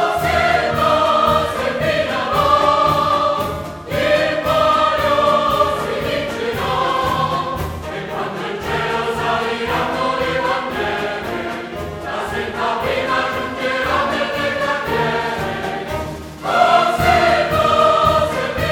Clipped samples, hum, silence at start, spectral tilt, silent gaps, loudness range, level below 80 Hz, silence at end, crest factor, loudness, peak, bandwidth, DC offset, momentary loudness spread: under 0.1%; none; 0 s; -4.5 dB/octave; none; 5 LU; -38 dBFS; 0 s; 18 dB; -17 LUFS; 0 dBFS; 19 kHz; under 0.1%; 11 LU